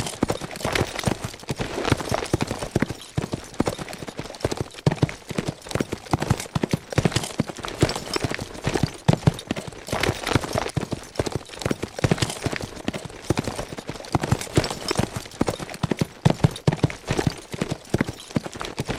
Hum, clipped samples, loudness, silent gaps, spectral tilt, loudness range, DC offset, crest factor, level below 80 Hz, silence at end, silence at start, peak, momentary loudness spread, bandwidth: none; under 0.1%; -26 LUFS; none; -5 dB/octave; 3 LU; under 0.1%; 24 dB; -42 dBFS; 0 s; 0 s; -2 dBFS; 8 LU; 16 kHz